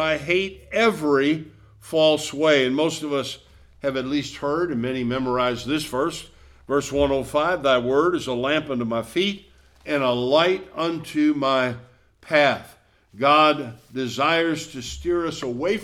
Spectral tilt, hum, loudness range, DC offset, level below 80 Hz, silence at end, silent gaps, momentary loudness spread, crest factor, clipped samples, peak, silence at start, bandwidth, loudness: -4.5 dB/octave; none; 4 LU; under 0.1%; -50 dBFS; 0 s; none; 10 LU; 18 dB; under 0.1%; -4 dBFS; 0 s; 15.5 kHz; -22 LUFS